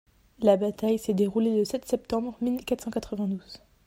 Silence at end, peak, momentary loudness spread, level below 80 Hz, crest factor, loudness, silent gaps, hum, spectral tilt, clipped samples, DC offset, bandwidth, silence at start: 0.3 s; -8 dBFS; 8 LU; -58 dBFS; 20 dB; -27 LUFS; none; none; -6.5 dB/octave; under 0.1%; under 0.1%; 16 kHz; 0.4 s